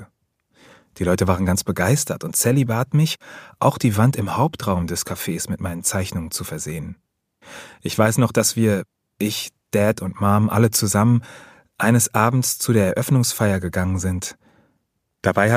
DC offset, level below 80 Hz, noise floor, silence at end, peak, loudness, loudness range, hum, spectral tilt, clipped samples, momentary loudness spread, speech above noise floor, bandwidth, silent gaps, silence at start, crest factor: under 0.1%; -48 dBFS; -71 dBFS; 0 s; 0 dBFS; -20 LUFS; 5 LU; none; -5 dB/octave; under 0.1%; 10 LU; 52 dB; 15.5 kHz; none; 0 s; 20 dB